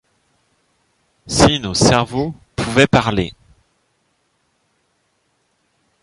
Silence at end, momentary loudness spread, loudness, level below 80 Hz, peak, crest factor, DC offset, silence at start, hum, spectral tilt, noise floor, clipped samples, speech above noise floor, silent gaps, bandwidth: 2.7 s; 12 LU; -16 LUFS; -38 dBFS; 0 dBFS; 20 dB; under 0.1%; 1.25 s; none; -4.5 dB/octave; -65 dBFS; under 0.1%; 50 dB; none; 11.5 kHz